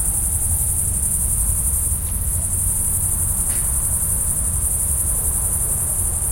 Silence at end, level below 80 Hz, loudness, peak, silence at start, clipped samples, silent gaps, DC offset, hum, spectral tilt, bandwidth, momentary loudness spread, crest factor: 0 s; -28 dBFS; -18 LUFS; -6 dBFS; 0 s; under 0.1%; none; under 0.1%; none; -3.5 dB/octave; 16.5 kHz; 1 LU; 14 dB